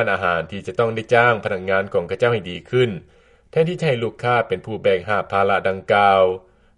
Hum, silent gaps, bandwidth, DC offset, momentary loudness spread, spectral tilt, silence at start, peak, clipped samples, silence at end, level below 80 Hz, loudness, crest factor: none; none; 10.5 kHz; under 0.1%; 9 LU; -6.5 dB/octave; 0 s; 0 dBFS; under 0.1%; 0.4 s; -54 dBFS; -19 LUFS; 18 dB